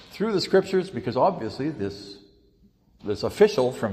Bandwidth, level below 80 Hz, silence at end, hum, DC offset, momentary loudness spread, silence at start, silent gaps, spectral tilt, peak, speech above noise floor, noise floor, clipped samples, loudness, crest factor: 14.5 kHz; -58 dBFS; 0 s; none; under 0.1%; 13 LU; 0.1 s; none; -6 dB/octave; -4 dBFS; 36 dB; -59 dBFS; under 0.1%; -24 LUFS; 20 dB